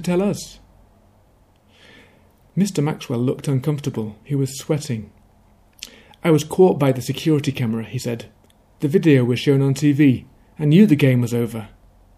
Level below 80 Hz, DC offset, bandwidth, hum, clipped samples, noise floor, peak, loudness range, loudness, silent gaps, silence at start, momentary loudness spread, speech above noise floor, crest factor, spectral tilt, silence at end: -54 dBFS; under 0.1%; 15 kHz; none; under 0.1%; -55 dBFS; -2 dBFS; 8 LU; -19 LUFS; none; 0 s; 14 LU; 37 dB; 18 dB; -7 dB/octave; 0.5 s